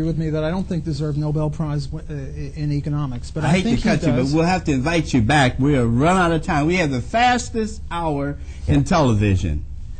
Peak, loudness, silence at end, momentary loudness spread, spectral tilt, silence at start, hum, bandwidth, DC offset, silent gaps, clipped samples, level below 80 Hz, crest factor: -6 dBFS; -20 LUFS; 0 s; 10 LU; -6.5 dB/octave; 0 s; none; 9.2 kHz; under 0.1%; none; under 0.1%; -32 dBFS; 14 dB